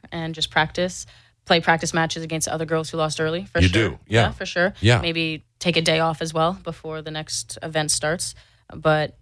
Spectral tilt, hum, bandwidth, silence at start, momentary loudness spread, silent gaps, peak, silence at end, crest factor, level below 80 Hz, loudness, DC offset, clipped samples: -4 dB/octave; none; 11 kHz; 0.1 s; 10 LU; none; -4 dBFS; 0.1 s; 18 dB; -44 dBFS; -22 LUFS; under 0.1%; under 0.1%